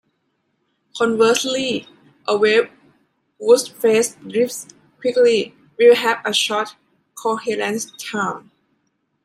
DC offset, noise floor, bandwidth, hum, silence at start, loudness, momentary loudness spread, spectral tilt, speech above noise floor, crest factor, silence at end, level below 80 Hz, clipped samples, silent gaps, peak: under 0.1%; -69 dBFS; 16 kHz; none; 0.95 s; -18 LUFS; 12 LU; -2.5 dB/octave; 52 dB; 18 dB; 0.85 s; -70 dBFS; under 0.1%; none; -2 dBFS